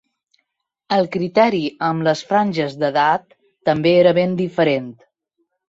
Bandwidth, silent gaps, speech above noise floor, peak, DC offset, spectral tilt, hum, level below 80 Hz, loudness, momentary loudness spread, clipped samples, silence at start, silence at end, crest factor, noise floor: 7.8 kHz; none; 56 dB; -2 dBFS; under 0.1%; -6.5 dB/octave; none; -62 dBFS; -18 LUFS; 8 LU; under 0.1%; 0.9 s; 0.75 s; 16 dB; -73 dBFS